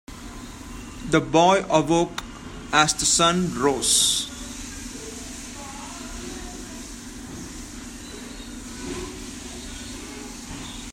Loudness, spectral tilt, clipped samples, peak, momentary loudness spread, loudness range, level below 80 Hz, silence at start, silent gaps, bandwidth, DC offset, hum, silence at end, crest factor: -21 LUFS; -3 dB/octave; under 0.1%; -2 dBFS; 19 LU; 16 LU; -44 dBFS; 0.1 s; none; 16 kHz; under 0.1%; none; 0 s; 24 dB